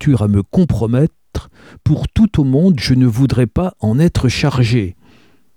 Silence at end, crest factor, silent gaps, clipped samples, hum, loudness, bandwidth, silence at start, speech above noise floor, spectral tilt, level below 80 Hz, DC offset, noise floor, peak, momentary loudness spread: 0.65 s; 12 dB; none; under 0.1%; none; -14 LUFS; 13.5 kHz; 0 s; 37 dB; -7.5 dB/octave; -30 dBFS; 0.2%; -50 dBFS; -2 dBFS; 7 LU